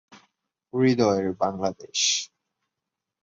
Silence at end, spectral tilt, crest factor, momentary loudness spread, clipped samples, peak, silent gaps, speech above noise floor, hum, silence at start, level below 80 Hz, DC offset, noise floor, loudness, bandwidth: 0.95 s; -3.5 dB/octave; 20 dB; 10 LU; under 0.1%; -8 dBFS; none; 62 dB; none; 0.1 s; -60 dBFS; under 0.1%; -86 dBFS; -24 LUFS; 7.8 kHz